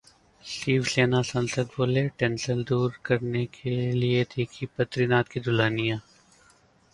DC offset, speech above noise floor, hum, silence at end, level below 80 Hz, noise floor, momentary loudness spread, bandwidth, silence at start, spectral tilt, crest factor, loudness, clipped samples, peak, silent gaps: under 0.1%; 34 dB; none; 0.95 s; -58 dBFS; -60 dBFS; 7 LU; 11.5 kHz; 0.45 s; -6 dB/octave; 20 dB; -26 LUFS; under 0.1%; -8 dBFS; none